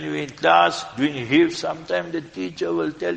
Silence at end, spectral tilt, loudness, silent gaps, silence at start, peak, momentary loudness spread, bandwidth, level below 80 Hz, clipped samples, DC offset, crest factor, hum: 0 s; -5 dB/octave; -21 LUFS; none; 0 s; -2 dBFS; 12 LU; 9.2 kHz; -60 dBFS; under 0.1%; under 0.1%; 20 dB; none